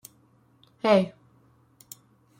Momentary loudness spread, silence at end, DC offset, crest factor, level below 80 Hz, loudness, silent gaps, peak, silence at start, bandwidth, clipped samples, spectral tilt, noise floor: 25 LU; 1.3 s; under 0.1%; 24 dB; -72 dBFS; -24 LUFS; none; -6 dBFS; 0.85 s; 16.5 kHz; under 0.1%; -6 dB/octave; -61 dBFS